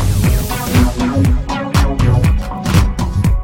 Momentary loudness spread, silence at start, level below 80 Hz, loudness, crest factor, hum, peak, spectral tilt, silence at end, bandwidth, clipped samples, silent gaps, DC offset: 4 LU; 0 s; -18 dBFS; -15 LUFS; 12 dB; none; -2 dBFS; -6 dB/octave; 0 s; 17 kHz; under 0.1%; none; under 0.1%